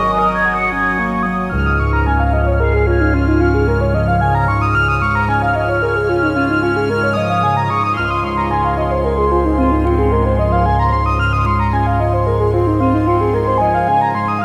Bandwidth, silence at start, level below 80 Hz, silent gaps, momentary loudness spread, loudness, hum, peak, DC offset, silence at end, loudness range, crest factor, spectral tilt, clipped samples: 10.5 kHz; 0 s; -22 dBFS; none; 2 LU; -15 LUFS; none; -4 dBFS; under 0.1%; 0 s; 1 LU; 12 dB; -8.5 dB/octave; under 0.1%